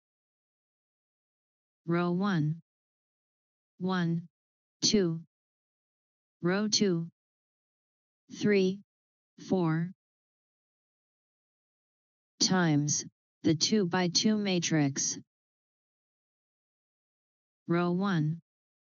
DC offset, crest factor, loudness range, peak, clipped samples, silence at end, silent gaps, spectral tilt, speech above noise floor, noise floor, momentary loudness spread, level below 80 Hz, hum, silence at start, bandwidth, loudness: under 0.1%; 18 dB; 7 LU; -16 dBFS; under 0.1%; 0.5 s; 2.62-3.78 s, 4.30-4.80 s, 5.27-6.40 s, 7.12-8.28 s, 8.84-9.37 s, 9.95-12.38 s, 13.12-13.41 s, 15.27-17.66 s; -5 dB/octave; over 62 dB; under -90 dBFS; 14 LU; -72 dBFS; none; 1.85 s; 7.4 kHz; -29 LUFS